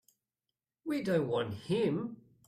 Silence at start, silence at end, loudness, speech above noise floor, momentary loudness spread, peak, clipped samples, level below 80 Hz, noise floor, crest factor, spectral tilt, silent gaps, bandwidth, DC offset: 0.85 s; 0.3 s; -33 LUFS; over 57 dB; 10 LU; -18 dBFS; under 0.1%; -72 dBFS; under -90 dBFS; 16 dB; -7 dB/octave; none; 14.5 kHz; under 0.1%